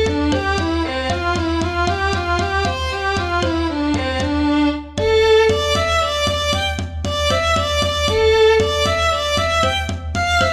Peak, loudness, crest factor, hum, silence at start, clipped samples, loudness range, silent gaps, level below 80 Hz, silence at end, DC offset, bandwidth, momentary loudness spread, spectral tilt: -4 dBFS; -17 LUFS; 14 dB; none; 0 s; under 0.1%; 3 LU; none; -30 dBFS; 0 s; under 0.1%; 14 kHz; 7 LU; -4.5 dB/octave